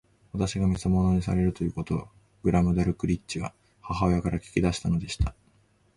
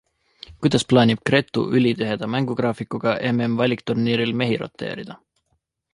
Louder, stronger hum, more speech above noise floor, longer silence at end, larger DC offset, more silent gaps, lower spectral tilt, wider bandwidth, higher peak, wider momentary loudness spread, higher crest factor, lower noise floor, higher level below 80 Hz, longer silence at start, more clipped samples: second, -27 LUFS vs -21 LUFS; neither; second, 38 dB vs 51 dB; about the same, 0.65 s vs 0.75 s; neither; neither; about the same, -7 dB/octave vs -6 dB/octave; about the same, 11.5 kHz vs 11.5 kHz; second, -8 dBFS vs -2 dBFS; about the same, 9 LU vs 10 LU; about the same, 18 dB vs 20 dB; second, -64 dBFS vs -71 dBFS; first, -38 dBFS vs -56 dBFS; second, 0.35 s vs 0.5 s; neither